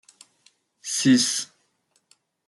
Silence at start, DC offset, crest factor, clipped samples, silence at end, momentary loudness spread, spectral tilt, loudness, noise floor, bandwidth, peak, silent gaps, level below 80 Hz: 0.85 s; under 0.1%; 20 dB; under 0.1%; 1 s; 20 LU; -2.5 dB/octave; -21 LUFS; -69 dBFS; 12 kHz; -8 dBFS; none; -72 dBFS